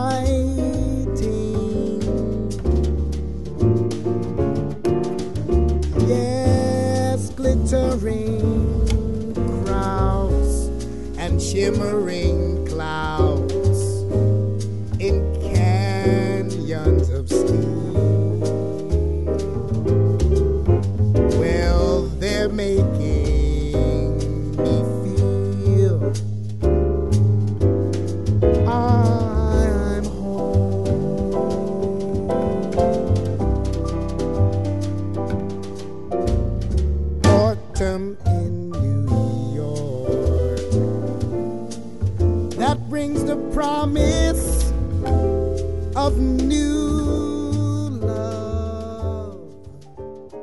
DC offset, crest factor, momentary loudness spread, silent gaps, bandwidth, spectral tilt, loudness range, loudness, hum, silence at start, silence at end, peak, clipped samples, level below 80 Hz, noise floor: 2%; 18 dB; 7 LU; none; 11.5 kHz; -7.5 dB/octave; 3 LU; -21 LUFS; none; 0 s; 0 s; -2 dBFS; under 0.1%; -26 dBFS; -41 dBFS